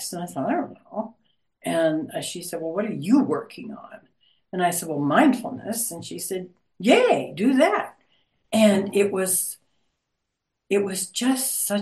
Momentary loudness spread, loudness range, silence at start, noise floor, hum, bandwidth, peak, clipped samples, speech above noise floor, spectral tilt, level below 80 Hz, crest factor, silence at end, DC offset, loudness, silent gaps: 15 LU; 5 LU; 0 s; -80 dBFS; none; 12.5 kHz; -4 dBFS; under 0.1%; 57 dB; -4 dB/octave; -72 dBFS; 20 dB; 0 s; under 0.1%; -23 LUFS; none